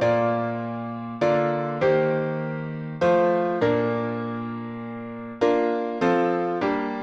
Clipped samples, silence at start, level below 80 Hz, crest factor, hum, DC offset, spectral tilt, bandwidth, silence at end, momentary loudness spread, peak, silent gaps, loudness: under 0.1%; 0 s; -60 dBFS; 16 dB; none; under 0.1%; -8 dB/octave; 8 kHz; 0 s; 11 LU; -8 dBFS; none; -24 LUFS